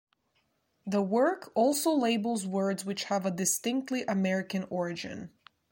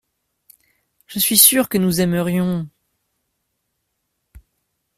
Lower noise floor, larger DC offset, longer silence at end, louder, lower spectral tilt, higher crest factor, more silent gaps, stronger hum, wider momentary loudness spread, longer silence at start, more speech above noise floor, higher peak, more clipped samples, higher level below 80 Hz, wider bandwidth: about the same, -75 dBFS vs -74 dBFS; neither; second, 0.45 s vs 2.3 s; second, -30 LUFS vs -15 LUFS; about the same, -4.5 dB/octave vs -3.5 dB/octave; second, 16 dB vs 22 dB; neither; neither; second, 10 LU vs 17 LU; second, 0.85 s vs 1.1 s; second, 45 dB vs 57 dB; second, -14 dBFS vs 0 dBFS; neither; second, -74 dBFS vs -54 dBFS; about the same, 16.5 kHz vs 16 kHz